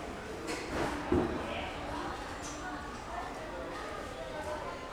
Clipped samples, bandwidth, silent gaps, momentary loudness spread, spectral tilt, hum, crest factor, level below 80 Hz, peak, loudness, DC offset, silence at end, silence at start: under 0.1%; over 20 kHz; none; 9 LU; -5 dB/octave; none; 22 dB; -50 dBFS; -16 dBFS; -38 LUFS; under 0.1%; 0 s; 0 s